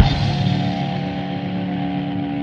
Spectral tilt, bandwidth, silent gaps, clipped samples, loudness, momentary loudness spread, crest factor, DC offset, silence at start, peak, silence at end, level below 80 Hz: -7.5 dB/octave; 7.4 kHz; none; under 0.1%; -22 LUFS; 5 LU; 20 dB; under 0.1%; 0 s; 0 dBFS; 0 s; -34 dBFS